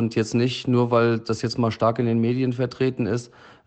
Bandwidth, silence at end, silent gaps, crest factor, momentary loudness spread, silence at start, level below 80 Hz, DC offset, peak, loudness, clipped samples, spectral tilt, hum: 8.6 kHz; 0.4 s; none; 16 dB; 6 LU; 0 s; -60 dBFS; under 0.1%; -8 dBFS; -23 LUFS; under 0.1%; -7 dB/octave; none